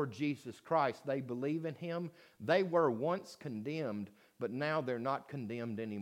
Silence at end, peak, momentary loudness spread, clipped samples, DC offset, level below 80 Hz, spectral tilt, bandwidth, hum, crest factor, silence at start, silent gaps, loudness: 0 s; -18 dBFS; 12 LU; under 0.1%; under 0.1%; -86 dBFS; -7 dB/octave; 16 kHz; none; 20 dB; 0 s; none; -37 LUFS